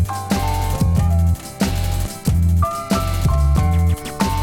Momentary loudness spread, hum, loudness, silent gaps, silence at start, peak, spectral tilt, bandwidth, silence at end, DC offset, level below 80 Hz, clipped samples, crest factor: 5 LU; none; -19 LUFS; none; 0 s; -6 dBFS; -6 dB/octave; 17 kHz; 0 s; under 0.1%; -22 dBFS; under 0.1%; 12 dB